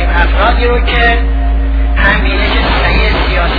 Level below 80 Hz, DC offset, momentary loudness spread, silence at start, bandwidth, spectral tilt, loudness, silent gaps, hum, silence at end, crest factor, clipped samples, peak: -12 dBFS; under 0.1%; 4 LU; 0 s; 5 kHz; -7.5 dB/octave; -11 LUFS; none; none; 0 s; 10 dB; 0.2%; 0 dBFS